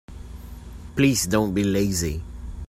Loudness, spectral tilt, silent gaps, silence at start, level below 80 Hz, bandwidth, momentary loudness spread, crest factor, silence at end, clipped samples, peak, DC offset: -23 LUFS; -5 dB/octave; none; 0.1 s; -38 dBFS; 16 kHz; 21 LU; 18 dB; 0.05 s; under 0.1%; -6 dBFS; under 0.1%